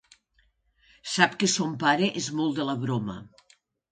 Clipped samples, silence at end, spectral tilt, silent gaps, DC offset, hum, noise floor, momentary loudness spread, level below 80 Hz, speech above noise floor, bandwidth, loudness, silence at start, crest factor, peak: under 0.1%; 0.65 s; -3.5 dB/octave; none; under 0.1%; none; -68 dBFS; 12 LU; -66 dBFS; 42 dB; 9.6 kHz; -26 LUFS; 1.05 s; 26 dB; -2 dBFS